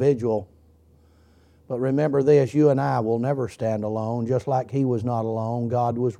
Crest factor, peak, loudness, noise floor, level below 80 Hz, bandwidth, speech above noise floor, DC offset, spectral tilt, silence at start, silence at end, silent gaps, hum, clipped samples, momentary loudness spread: 16 dB; -6 dBFS; -23 LUFS; -56 dBFS; -60 dBFS; 10 kHz; 34 dB; under 0.1%; -9 dB/octave; 0 s; 0.05 s; none; none; under 0.1%; 8 LU